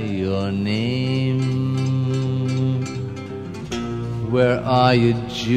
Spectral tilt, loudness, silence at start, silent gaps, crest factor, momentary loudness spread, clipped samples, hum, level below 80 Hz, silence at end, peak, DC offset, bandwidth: -7 dB/octave; -21 LUFS; 0 s; none; 18 dB; 12 LU; under 0.1%; none; -48 dBFS; 0 s; -2 dBFS; 0.2%; 8.8 kHz